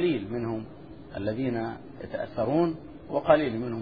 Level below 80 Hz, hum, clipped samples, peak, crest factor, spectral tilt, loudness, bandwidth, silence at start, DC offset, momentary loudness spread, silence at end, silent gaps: -54 dBFS; none; under 0.1%; -6 dBFS; 22 dB; -10 dB/octave; -29 LUFS; 5 kHz; 0 s; 0.2%; 18 LU; 0 s; none